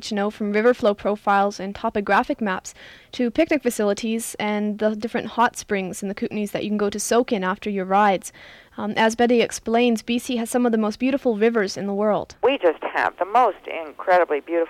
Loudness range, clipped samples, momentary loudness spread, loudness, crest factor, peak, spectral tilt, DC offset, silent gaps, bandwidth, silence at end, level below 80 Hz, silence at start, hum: 3 LU; under 0.1%; 8 LU; -22 LUFS; 14 dB; -8 dBFS; -4.5 dB/octave; under 0.1%; none; 15.5 kHz; 0 s; -56 dBFS; 0 s; none